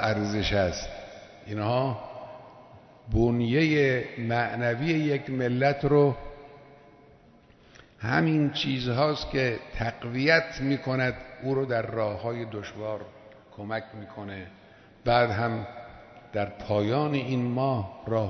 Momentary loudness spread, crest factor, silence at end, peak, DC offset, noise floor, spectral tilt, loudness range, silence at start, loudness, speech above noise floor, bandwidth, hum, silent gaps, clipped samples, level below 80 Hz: 18 LU; 20 dB; 0 s; -8 dBFS; under 0.1%; -56 dBFS; -6.5 dB/octave; 5 LU; 0 s; -27 LUFS; 30 dB; 6.4 kHz; none; none; under 0.1%; -48 dBFS